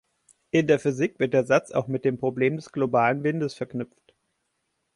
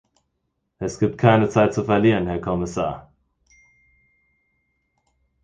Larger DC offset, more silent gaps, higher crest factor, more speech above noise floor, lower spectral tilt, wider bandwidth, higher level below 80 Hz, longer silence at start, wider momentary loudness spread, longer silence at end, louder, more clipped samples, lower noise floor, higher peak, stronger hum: neither; neither; about the same, 18 dB vs 22 dB; about the same, 52 dB vs 55 dB; about the same, -7 dB/octave vs -7 dB/octave; first, 11.5 kHz vs 9.4 kHz; second, -66 dBFS vs -48 dBFS; second, 0.55 s vs 0.8 s; second, 9 LU vs 13 LU; second, 1.1 s vs 2.45 s; second, -25 LUFS vs -20 LUFS; neither; about the same, -76 dBFS vs -75 dBFS; second, -8 dBFS vs 0 dBFS; neither